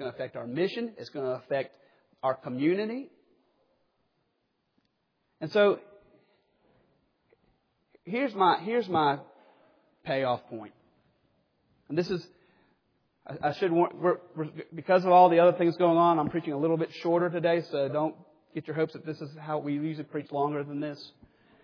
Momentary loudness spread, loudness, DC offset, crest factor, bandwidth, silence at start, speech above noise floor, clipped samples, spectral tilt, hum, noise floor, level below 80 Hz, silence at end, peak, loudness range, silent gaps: 16 LU; -28 LUFS; under 0.1%; 22 dB; 5.4 kHz; 0 s; 49 dB; under 0.1%; -8 dB/octave; none; -77 dBFS; -74 dBFS; 0.55 s; -8 dBFS; 11 LU; none